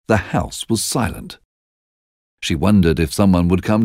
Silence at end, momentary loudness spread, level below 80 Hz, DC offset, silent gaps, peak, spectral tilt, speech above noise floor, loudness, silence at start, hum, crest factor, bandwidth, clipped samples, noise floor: 0 s; 11 LU; -36 dBFS; under 0.1%; 1.45-2.38 s; -2 dBFS; -5.5 dB/octave; over 74 dB; -17 LUFS; 0.1 s; none; 16 dB; 16 kHz; under 0.1%; under -90 dBFS